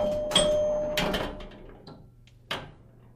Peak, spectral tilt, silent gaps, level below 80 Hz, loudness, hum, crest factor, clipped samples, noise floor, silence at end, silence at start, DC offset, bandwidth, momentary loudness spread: -10 dBFS; -3 dB/octave; none; -44 dBFS; -27 LUFS; none; 20 dB; under 0.1%; -53 dBFS; 0.4 s; 0 s; under 0.1%; 15.5 kHz; 25 LU